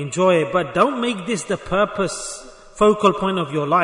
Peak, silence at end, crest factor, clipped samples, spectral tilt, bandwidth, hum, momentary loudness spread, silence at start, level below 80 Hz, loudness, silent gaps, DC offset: -2 dBFS; 0 s; 16 dB; under 0.1%; -5 dB/octave; 11 kHz; none; 8 LU; 0 s; -48 dBFS; -19 LUFS; none; under 0.1%